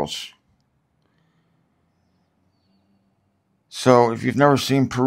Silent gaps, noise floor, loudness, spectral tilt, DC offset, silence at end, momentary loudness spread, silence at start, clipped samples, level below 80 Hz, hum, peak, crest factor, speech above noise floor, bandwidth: none; -67 dBFS; -18 LUFS; -5.5 dB/octave; under 0.1%; 0 s; 18 LU; 0 s; under 0.1%; -60 dBFS; none; 0 dBFS; 22 dB; 50 dB; 16 kHz